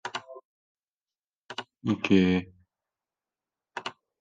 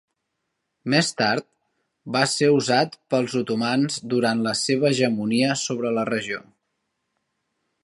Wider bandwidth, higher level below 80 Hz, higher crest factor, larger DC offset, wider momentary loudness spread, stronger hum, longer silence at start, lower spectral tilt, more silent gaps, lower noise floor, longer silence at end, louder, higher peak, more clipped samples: second, 7.8 kHz vs 11.5 kHz; about the same, -72 dBFS vs -70 dBFS; about the same, 22 dB vs 20 dB; neither; first, 18 LU vs 7 LU; neither; second, 0.05 s vs 0.85 s; first, -6.5 dB/octave vs -4 dB/octave; first, 0.45-0.75 s, 0.93-0.98 s, 1.38-1.49 s vs none; first, under -90 dBFS vs -78 dBFS; second, 0.3 s vs 1.45 s; second, -27 LUFS vs -22 LUFS; second, -10 dBFS vs -4 dBFS; neither